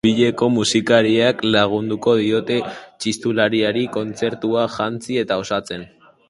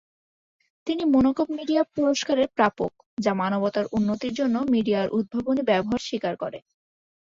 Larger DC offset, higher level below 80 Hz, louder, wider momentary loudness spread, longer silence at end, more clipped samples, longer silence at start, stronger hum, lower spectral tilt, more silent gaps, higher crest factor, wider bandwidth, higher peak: neither; about the same, -54 dBFS vs -56 dBFS; first, -19 LUFS vs -24 LUFS; about the same, 9 LU vs 9 LU; second, 0.45 s vs 0.8 s; neither; second, 0.05 s vs 0.85 s; neither; about the same, -4.5 dB/octave vs -5.5 dB/octave; second, none vs 3.06-3.17 s; about the same, 18 dB vs 16 dB; first, 11.5 kHz vs 7.6 kHz; first, 0 dBFS vs -8 dBFS